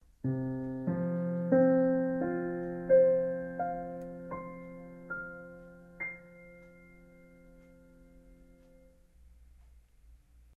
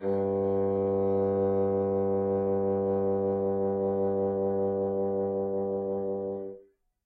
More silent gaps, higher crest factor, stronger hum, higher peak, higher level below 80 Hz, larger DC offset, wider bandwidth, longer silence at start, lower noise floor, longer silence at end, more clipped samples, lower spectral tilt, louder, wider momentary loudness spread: neither; first, 20 dB vs 10 dB; neither; first, -14 dBFS vs -18 dBFS; about the same, -62 dBFS vs -66 dBFS; neither; about the same, 2.4 kHz vs 2.6 kHz; first, 0.25 s vs 0 s; about the same, -60 dBFS vs -57 dBFS; about the same, 0.4 s vs 0.45 s; neither; second, -11 dB/octave vs -12.5 dB/octave; second, -31 LUFS vs -28 LUFS; first, 24 LU vs 5 LU